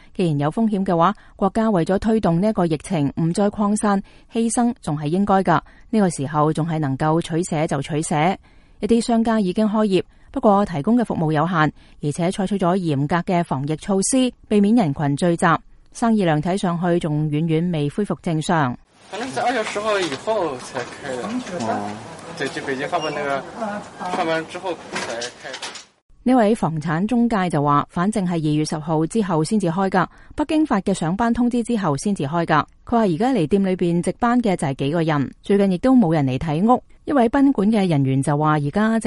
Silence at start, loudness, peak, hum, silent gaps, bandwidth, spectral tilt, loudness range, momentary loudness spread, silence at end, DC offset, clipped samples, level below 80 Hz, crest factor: 0.15 s; -20 LUFS; -2 dBFS; none; 26.02-26.09 s; 11.5 kHz; -6 dB/octave; 6 LU; 9 LU; 0 s; under 0.1%; under 0.1%; -46 dBFS; 16 dB